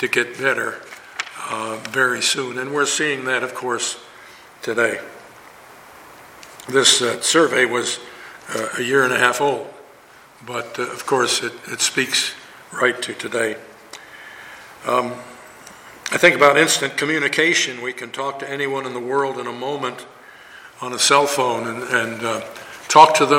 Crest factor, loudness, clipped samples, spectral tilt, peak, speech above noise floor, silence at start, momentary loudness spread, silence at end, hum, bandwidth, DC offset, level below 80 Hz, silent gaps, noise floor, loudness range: 20 dB; -19 LUFS; under 0.1%; -2 dB/octave; 0 dBFS; 27 dB; 0 s; 21 LU; 0 s; none; 17 kHz; under 0.1%; -66 dBFS; none; -47 dBFS; 7 LU